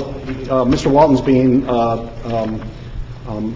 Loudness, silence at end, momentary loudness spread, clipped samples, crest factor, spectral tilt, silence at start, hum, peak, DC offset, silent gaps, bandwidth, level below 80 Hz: -16 LUFS; 0 s; 18 LU; under 0.1%; 16 dB; -7.5 dB/octave; 0 s; none; -2 dBFS; under 0.1%; none; 7.8 kHz; -32 dBFS